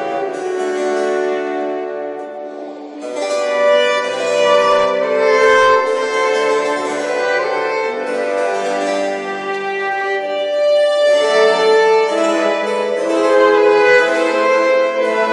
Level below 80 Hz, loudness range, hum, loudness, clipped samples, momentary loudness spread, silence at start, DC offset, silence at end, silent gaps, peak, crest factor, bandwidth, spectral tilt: -62 dBFS; 6 LU; none; -15 LUFS; under 0.1%; 10 LU; 0 s; under 0.1%; 0 s; none; 0 dBFS; 14 dB; 11.5 kHz; -2.5 dB/octave